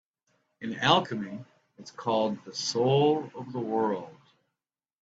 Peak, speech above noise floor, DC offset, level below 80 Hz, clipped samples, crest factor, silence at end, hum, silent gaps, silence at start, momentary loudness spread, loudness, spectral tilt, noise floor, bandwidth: -8 dBFS; 62 dB; under 0.1%; -70 dBFS; under 0.1%; 22 dB; 0.9 s; none; none; 0.6 s; 17 LU; -28 LUFS; -5 dB/octave; -89 dBFS; 8 kHz